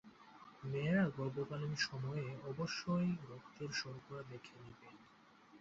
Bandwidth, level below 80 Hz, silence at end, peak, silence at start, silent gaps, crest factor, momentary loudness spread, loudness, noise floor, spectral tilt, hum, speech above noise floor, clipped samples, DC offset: 7.6 kHz; -72 dBFS; 0 s; -24 dBFS; 0.05 s; none; 18 dB; 22 LU; -41 LUFS; -65 dBFS; -5 dB/octave; none; 24 dB; under 0.1%; under 0.1%